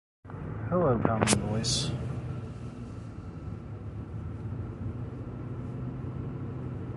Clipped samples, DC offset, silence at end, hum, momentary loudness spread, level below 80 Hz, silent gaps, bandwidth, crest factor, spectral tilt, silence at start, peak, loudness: under 0.1%; under 0.1%; 0 s; none; 15 LU; -46 dBFS; none; 11.5 kHz; 26 dB; -5 dB/octave; 0.25 s; -6 dBFS; -33 LUFS